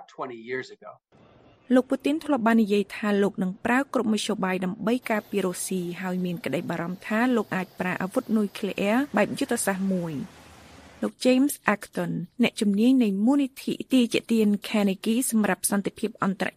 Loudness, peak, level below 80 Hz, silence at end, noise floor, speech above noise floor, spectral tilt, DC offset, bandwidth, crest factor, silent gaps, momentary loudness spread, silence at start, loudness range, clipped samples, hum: -25 LUFS; -4 dBFS; -66 dBFS; 0.05 s; -49 dBFS; 24 dB; -5 dB/octave; under 0.1%; 15.5 kHz; 22 dB; none; 9 LU; 0 s; 4 LU; under 0.1%; none